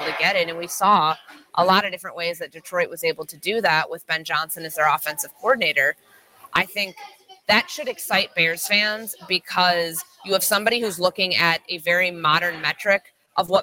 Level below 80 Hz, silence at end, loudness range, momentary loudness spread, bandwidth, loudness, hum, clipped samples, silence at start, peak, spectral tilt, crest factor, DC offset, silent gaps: -66 dBFS; 0 s; 3 LU; 10 LU; 17 kHz; -21 LUFS; none; under 0.1%; 0 s; -4 dBFS; -2.5 dB/octave; 18 dB; under 0.1%; none